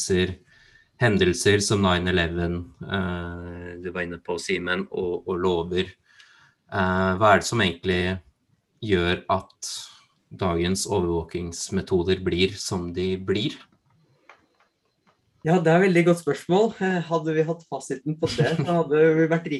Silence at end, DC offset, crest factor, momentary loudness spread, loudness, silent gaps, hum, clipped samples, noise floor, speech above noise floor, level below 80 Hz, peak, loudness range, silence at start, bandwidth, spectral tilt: 0 s; under 0.1%; 20 dB; 13 LU; -24 LUFS; none; none; under 0.1%; -68 dBFS; 45 dB; -50 dBFS; -4 dBFS; 5 LU; 0 s; 12.5 kHz; -5 dB/octave